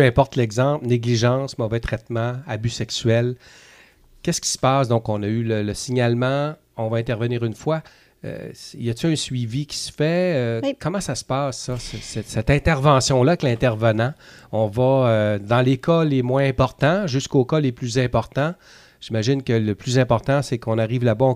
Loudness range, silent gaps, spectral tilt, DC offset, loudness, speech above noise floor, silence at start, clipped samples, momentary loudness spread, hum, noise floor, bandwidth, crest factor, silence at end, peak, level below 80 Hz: 5 LU; none; -6 dB/octave; under 0.1%; -21 LUFS; 31 dB; 0 s; under 0.1%; 10 LU; none; -51 dBFS; 14 kHz; 18 dB; 0 s; -2 dBFS; -42 dBFS